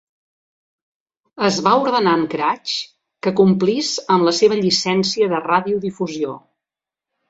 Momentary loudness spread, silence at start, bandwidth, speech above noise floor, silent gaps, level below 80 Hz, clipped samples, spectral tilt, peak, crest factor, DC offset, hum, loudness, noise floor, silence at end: 10 LU; 1.35 s; 7.8 kHz; 70 dB; none; -62 dBFS; under 0.1%; -4.5 dB/octave; -2 dBFS; 18 dB; under 0.1%; none; -18 LUFS; -88 dBFS; 0.9 s